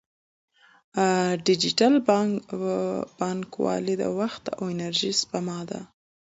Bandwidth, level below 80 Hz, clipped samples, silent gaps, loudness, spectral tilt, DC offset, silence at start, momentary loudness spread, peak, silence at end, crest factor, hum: 8 kHz; -66 dBFS; under 0.1%; none; -25 LUFS; -4.5 dB/octave; under 0.1%; 0.95 s; 12 LU; -6 dBFS; 0.45 s; 20 dB; none